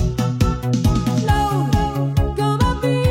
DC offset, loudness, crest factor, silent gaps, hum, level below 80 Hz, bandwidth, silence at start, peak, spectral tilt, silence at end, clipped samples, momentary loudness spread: under 0.1%; -19 LUFS; 12 dB; none; none; -26 dBFS; 16.5 kHz; 0 s; -4 dBFS; -6.5 dB/octave; 0 s; under 0.1%; 2 LU